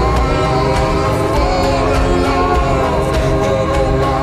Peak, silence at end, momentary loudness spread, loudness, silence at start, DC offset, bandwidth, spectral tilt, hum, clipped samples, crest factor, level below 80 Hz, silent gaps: -4 dBFS; 0 s; 1 LU; -15 LUFS; 0 s; under 0.1%; 14.5 kHz; -6 dB/octave; none; under 0.1%; 10 dB; -20 dBFS; none